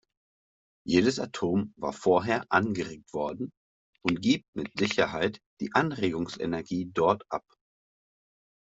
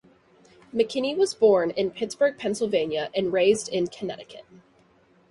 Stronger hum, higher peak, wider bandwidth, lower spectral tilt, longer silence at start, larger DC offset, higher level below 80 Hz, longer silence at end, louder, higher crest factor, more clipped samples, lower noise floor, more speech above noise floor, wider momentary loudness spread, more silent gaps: neither; about the same, -6 dBFS vs -8 dBFS; second, 8 kHz vs 11.5 kHz; first, -5.5 dB/octave vs -4 dB/octave; about the same, 0.85 s vs 0.75 s; neither; about the same, -64 dBFS vs -66 dBFS; first, 1.35 s vs 0.9 s; second, -29 LUFS vs -24 LUFS; first, 24 dB vs 18 dB; neither; first, under -90 dBFS vs -60 dBFS; first, over 62 dB vs 36 dB; about the same, 11 LU vs 13 LU; first, 3.57-3.93 s, 4.48-4.53 s, 5.46-5.57 s vs none